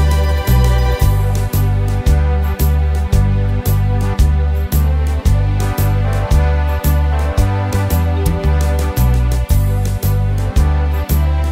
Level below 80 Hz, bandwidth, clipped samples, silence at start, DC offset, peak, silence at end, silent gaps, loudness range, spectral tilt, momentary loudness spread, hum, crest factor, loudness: -16 dBFS; 16.5 kHz; under 0.1%; 0 s; under 0.1%; 0 dBFS; 0 s; none; 1 LU; -6.5 dB/octave; 2 LU; none; 12 dB; -15 LUFS